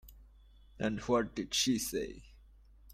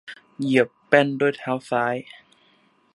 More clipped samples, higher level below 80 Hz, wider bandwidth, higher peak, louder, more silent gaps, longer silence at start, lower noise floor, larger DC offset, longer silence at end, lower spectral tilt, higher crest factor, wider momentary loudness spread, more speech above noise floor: neither; first, -56 dBFS vs -74 dBFS; first, 16 kHz vs 11.5 kHz; second, -18 dBFS vs -2 dBFS; second, -34 LUFS vs -22 LUFS; neither; about the same, 0.05 s vs 0.05 s; about the same, -59 dBFS vs -61 dBFS; neither; second, 0 s vs 0.9 s; second, -3.5 dB/octave vs -6 dB/octave; about the same, 20 dB vs 22 dB; about the same, 11 LU vs 11 LU; second, 26 dB vs 39 dB